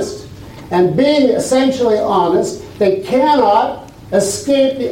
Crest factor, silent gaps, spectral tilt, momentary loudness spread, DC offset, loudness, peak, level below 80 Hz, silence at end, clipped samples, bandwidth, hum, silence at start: 12 dB; none; -5 dB/octave; 12 LU; under 0.1%; -14 LUFS; -2 dBFS; -46 dBFS; 0 s; under 0.1%; 16.5 kHz; none; 0 s